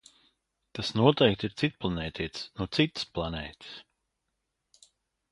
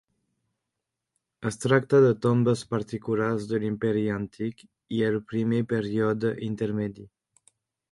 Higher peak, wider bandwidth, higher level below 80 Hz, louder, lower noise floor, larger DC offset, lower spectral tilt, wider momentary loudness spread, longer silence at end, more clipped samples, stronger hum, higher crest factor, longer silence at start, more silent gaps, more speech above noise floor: about the same, -6 dBFS vs -6 dBFS; about the same, 11.5 kHz vs 11.5 kHz; first, -52 dBFS vs -62 dBFS; second, -29 LUFS vs -26 LUFS; about the same, -82 dBFS vs -85 dBFS; neither; about the same, -6 dB/octave vs -7 dB/octave; first, 19 LU vs 12 LU; first, 1.5 s vs 0.85 s; neither; neither; first, 26 dB vs 20 dB; second, 0.75 s vs 1.4 s; neither; second, 53 dB vs 60 dB